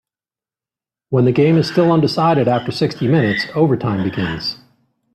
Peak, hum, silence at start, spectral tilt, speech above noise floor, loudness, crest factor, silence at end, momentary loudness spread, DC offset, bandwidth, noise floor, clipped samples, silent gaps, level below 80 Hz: -2 dBFS; none; 1.1 s; -7.5 dB/octave; over 75 dB; -16 LUFS; 14 dB; 0.6 s; 7 LU; under 0.1%; 12.5 kHz; under -90 dBFS; under 0.1%; none; -52 dBFS